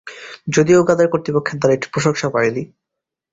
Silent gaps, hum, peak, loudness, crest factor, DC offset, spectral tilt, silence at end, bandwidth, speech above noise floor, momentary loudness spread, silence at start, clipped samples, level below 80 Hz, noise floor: none; none; -2 dBFS; -16 LUFS; 16 dB; under 0.1%; -5.5 dB/octave; 0.65 s; 8 kHz; 66 dB; 16 LU; 0.05 s; under 0.1%; -54 dBFS; -82 dBFS